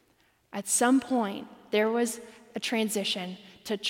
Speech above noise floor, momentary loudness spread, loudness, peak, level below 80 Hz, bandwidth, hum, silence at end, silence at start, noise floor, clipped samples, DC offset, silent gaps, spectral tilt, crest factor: 39 dB; 17 LU; -28 LUFS; -12 dBFS; -74 dBFS; 16.5 kHz; none; 0 s; 0.55 s; -67 dBFS; under 0.1%; under 0.1%; none; -3 dB/octave; 18 dB